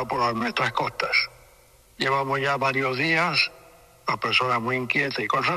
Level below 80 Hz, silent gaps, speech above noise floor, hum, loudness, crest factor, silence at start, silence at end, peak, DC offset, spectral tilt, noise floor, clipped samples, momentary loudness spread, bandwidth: -58 dBFS; none; 31 dB; none; -23 LUFS; 18 dB; 0 s; 0 s; -6 dBFS; under 0.1%; -4.5 dB/octave; -55 dBFS; under 0.1%; 6 LU; 14.5 kHz